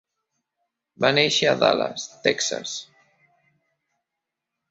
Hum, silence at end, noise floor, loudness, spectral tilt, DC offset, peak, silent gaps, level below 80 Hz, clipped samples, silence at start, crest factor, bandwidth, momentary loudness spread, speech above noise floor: none; 1.85 s; -84 dBFS; -21 LUFS; -2.5 dB/octave; under 0.1%; -2 dBFS; none; -66 dBFS; under 0.1%; 1 s; 24 dB; 8 kHz; 12 LU; 62 dB